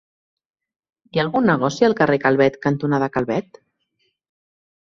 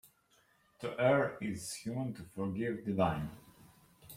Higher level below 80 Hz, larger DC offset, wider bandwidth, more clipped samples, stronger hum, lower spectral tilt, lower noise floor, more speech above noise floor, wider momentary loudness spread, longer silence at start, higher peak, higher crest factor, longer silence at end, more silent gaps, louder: first, -58 dBFS vs -64 dBFS; neither; second, 7.6 kHz vs 16.5 kHz; neither; neither; about the same, -6.5 dB/octave vs -6 dB/octave; about the same, -70 dBFS vs -71 dBFS; first, 52 dB vs 36 dB; second, 7 LU vs 13 LU; first, 1.15 s vs 0.05 s; first, -2 dBFS vs -16 dBFS; about the same, 20 dB vs 20 dB; first, 1.45 s vs 0 s; neither; first, -19 LUFS vs -36 LUFS